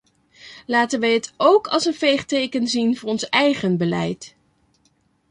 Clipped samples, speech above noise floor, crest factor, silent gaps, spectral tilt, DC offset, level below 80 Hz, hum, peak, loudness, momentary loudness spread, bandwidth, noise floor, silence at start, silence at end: under 0.1%; 44 dB; 18 dB; none; -4.5 dB/octave; under 0.1%; -62 dBFS; none; -4 dBFS; -20 LUFS; 8 LU; 11 kHz; -63 dBFS; 0.45 s; 1.05 s